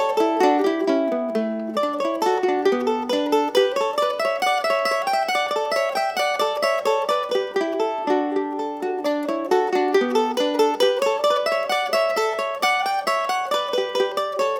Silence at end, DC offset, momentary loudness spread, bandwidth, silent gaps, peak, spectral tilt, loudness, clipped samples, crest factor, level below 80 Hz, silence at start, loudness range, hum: 0 s; under 0.1%; 5 LU; 18.5 kHz; none; -4 dBFS; -3 dB/octave; -21 LUFS; under 0.1%; 16 dB; -72 dBFS; 0 s; 2 LU; none